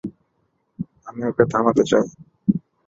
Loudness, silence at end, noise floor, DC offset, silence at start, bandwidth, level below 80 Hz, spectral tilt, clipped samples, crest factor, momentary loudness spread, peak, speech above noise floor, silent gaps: -20 LUFS; 0.3 s; -69 dBFS; under 0.1%; 0.05 s; 7.8 kHz; -56 dBFS; -6.5 dB/octave; under 0.1%; 20 dB; 18 LU; -2 dBFS; 50 dB; none